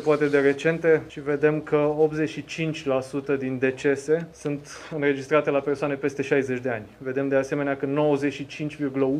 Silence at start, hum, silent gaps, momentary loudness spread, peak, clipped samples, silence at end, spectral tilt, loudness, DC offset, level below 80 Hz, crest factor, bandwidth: 0 s; none; none; 10 LU; -6 dBFS; under 0.1%; 0 s; -6.5 dB/octave; -25 LUFS; under 0.1%; -60 dBFS; 18 dB; 10.5 kHz